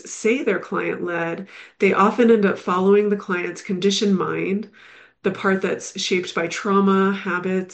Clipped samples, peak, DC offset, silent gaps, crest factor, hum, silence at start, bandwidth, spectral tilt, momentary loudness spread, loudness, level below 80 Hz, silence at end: under 0.1%; -4 dBFS; under 0.1%; none; 16 dB; none; 0.05 s; 8.8 kHz; -5 dB/octave; 10 LU; -20 LUFS; -70 dBFS; 0 s